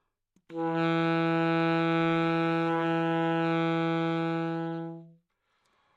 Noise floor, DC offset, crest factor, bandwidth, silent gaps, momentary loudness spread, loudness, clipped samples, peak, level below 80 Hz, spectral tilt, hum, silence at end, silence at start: -75 dBFS; under 0.1%; 12 dB; 7.6 kHz; none; 9 LU; -28 LUFS; under 0.1%; -18 dBFS; -74 dBFS; -8 dB/octave; none; 0.85 s; 0.5 s